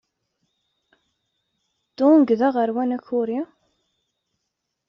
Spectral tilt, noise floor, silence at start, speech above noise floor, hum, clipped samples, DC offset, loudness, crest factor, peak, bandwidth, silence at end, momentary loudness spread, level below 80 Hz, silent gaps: -5.5 dB/octave; -79 dBFS; 2 s; 60 dB; none; under 0.1%; under 0.1%; -20 LUFS; 18 dB; -6 dBFS; 6 kHz; 1.45 s; 12 LU; -72 dBFS; none